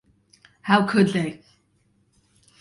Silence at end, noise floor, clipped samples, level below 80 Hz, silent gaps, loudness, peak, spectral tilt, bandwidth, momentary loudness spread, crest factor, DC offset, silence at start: 1.25 s; -65 dBFS; under 0.1%; -64 dBFS; none; -21 LUFS; -6 dBFS; -6.5 dB/octave; 11.5 kHz; 14 LU; 20 dB; under 0.1%; 0.65 s